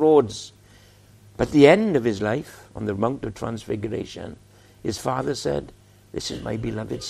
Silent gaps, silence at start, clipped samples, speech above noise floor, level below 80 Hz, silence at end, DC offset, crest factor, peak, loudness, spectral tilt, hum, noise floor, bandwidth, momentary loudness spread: none; 0 s; under 0.1%; 29 dB; -50 dBFS; 0 s; under 0.1%; 22 dB; 0 dBFS; -23 LUFS; -6 dB/octave; none; -51 dBFS; 14 kHz; 20 LU